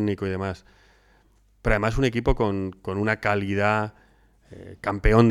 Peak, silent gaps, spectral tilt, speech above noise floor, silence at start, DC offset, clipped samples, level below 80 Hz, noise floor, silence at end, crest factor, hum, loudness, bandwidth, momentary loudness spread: -2 dBFS; none; -7 dB/octave; 37 dB; 0 s; under 0.1%; under 0.1%; -34 dBFS; -60 dBFS; 0 s; 22 dB; none; -25 LUFS; 12.5 kHz; 11 LU